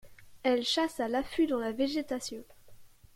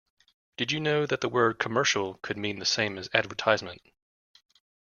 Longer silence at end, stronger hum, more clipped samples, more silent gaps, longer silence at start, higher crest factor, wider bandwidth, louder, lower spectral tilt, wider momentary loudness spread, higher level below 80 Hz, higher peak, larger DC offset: second, 0.3 s vs 1.05 s; neither; neither; neither; second, 0.05 s vs 0.6 s; second, 18 dB vs 24 dB; first, 16.5 kHz vs 7.2 kHz; second, -31 LUFS vs -27 LUFS; about the same, -3 dB/octave vs -3.5 dB/octave; about the same, 9 LU vs 8 LU; first, -60 dBFS vs -68 dBFS; second, -16 dBFS vs -4 dBFS; neither